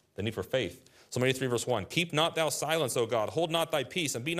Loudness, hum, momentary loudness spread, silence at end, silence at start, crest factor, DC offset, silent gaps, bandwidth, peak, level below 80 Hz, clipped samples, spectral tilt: -30 LUFS; none; 5 LU; 0 s; 0.2 s; 20 dB; under 0.1%; none; 15.5 kHz; -10 dBFS; -68 dBFS; under 0.1%; -4 dB/octave